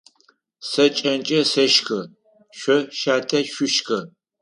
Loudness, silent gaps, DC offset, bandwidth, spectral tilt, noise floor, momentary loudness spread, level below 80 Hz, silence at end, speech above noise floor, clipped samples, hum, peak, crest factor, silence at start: -20 LUFS; none; under 0.1%; 11 kHz; -3 dB/octave; -61 dBFS; 12 LU; -72 dBFS; 0.35 s; 41 dB; under 0.1%; none; -4 dBFS; 18 dB; 0.6 s